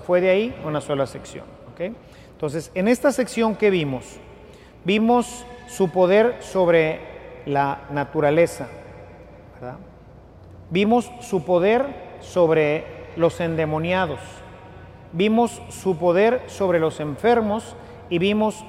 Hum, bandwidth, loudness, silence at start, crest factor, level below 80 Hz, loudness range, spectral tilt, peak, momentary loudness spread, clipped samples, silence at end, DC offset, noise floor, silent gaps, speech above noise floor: none; 14.5 kHz; -21 LUFS; 0 s; 16 dB; -52 dBFS; 4 LU; -6 dB/octave; -6 dBFS; 19 LU; under 0.1%; 0 s; under 0.1%; -45 dBFS; none; 24 dB